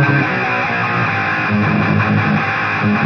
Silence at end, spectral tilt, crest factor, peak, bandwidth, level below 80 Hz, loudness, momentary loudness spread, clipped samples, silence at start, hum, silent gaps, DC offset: 0 s; -7.5 dB/octave; 12 dB; -2 dBFS; 6.6 kHz; -50 dBFS; -15 LUFS; 2 LU; under 0.1%; 0 s; none; none; under 0.1%